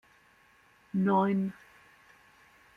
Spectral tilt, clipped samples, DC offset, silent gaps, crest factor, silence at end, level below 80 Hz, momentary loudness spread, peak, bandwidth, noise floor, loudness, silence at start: -9 dB/octave; under 0.1%; under 0.1%; none; 18 dB; 1.25 s; -74 dBFS; 13 LU; -16 dBFS; 4.7 kHz; -63 dBFS; -29 LUFS; 0.95 s